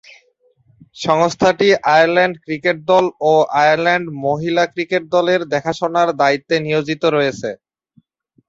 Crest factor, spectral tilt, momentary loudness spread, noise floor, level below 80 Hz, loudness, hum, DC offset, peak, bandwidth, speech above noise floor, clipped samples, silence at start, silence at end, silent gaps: 16 dB; -5 dB/octave; 8 LU; -58 dBFS; -58 dBFS; -16 LUFS; none; under 0.1%; 0 dBFS; 7.8 kHz; 43 dB; under 0.1%; 0.95 s; 0.95 s; none